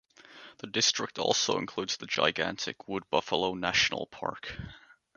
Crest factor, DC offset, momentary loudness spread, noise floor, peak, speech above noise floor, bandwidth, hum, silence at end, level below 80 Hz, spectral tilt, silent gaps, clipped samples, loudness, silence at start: 24 dB; under 0.1%; 16 LU; -53 dBFS; -8 dBFS; 22 dB; 10.5 kHz; none; 0.4 s; -60 dBFS; -2 dB/octave; none; under 0.1%; -29 LUFS; 0.3 s